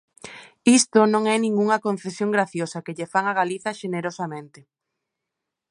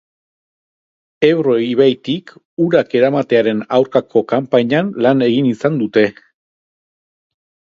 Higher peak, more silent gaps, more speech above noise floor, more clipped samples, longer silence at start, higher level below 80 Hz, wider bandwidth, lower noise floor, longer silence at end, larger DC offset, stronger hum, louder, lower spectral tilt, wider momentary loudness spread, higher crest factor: second, -4 dBFS vs 0 dBFS; second, none vs 2.45-2.57 s; second, 62 dB vs over 76 dB; neither; second, 0.25 s vs 1.2 s; second, -72 dBFS vs -62 dBFS; first, 11.5 kHz vs 7.4 kHz; second, -84 dBFS vs under -90 dBFS; second, 1.25 s vs 1.6 s; neither; neither; second, -22 LUFS vs -15 LUFS; second, -4 dB/octave vs -7.5 dB/octave; first, 15 LU vs 6 LU; about the same, 20 dB vs 16 dB